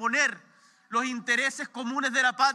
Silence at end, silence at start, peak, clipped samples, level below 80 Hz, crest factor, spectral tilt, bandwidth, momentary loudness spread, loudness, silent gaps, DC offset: 0 s; 0 s; -10 dBFS; under 0.1%; under -90 dBFS; 18 dB; -1 dB/octave; 13 kHz; 8 LU; -27 LUFS; none; under 0.1%